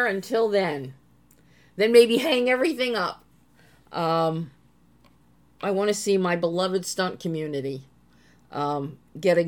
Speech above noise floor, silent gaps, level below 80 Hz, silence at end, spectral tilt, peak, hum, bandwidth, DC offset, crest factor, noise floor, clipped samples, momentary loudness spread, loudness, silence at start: 36 dB; none; -66 dBFS; 0 s; -4.5 dB/octave; -4 dBFS; none; 17.5 kHz; under 0.1%; 22 dB; -59 dBFS; under 0.1%; 17 LU; -24 LUFS; 0 s